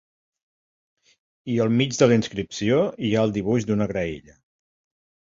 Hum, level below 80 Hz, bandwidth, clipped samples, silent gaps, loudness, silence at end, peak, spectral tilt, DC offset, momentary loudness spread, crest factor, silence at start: none; -54 dBFS; 7.8 kHz; under 0.1%; none; -22 LUFS; 1.2 s; -4 dBFS; -6 dB/octave; under 0.1%; 11 LU; 20 dB; 1.45 s